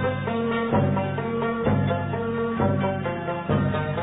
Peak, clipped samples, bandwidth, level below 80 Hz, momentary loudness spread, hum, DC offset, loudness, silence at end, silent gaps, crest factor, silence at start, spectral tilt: -10 dBFS; under 0.1%; 4 kHz; -44 dBFS; 4 LU; none; under 0.1%; -25 LUFS; 0 s; none; 14 dB; 0 s; -12 dB/octave